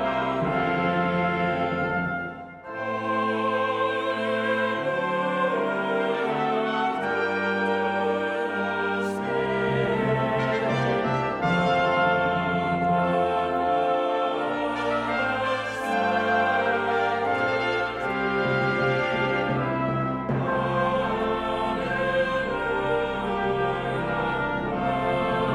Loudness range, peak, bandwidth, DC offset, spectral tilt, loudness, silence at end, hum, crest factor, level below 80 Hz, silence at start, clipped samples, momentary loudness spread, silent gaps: 2 LU; -12 dBFS; 12 kHz; under 0.1%; -6.5 dB/octave; -25 LUFS; 0 s; none; 14 dB; -50 dBFS; 0 s; under 0.1%; 4 LU; none